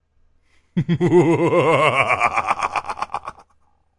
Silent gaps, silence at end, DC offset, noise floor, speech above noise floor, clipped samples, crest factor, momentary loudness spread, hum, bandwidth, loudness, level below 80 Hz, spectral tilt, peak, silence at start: none; 0.7 s; under 0.1%; -60 dBFS; 44 dB; under 0.1%; 18 dB; 13 LU; none; 11.5 kHz; -18 LUFS; -54 dBFS; -6.5 dB/octave; -2 dBFS; 0.75 s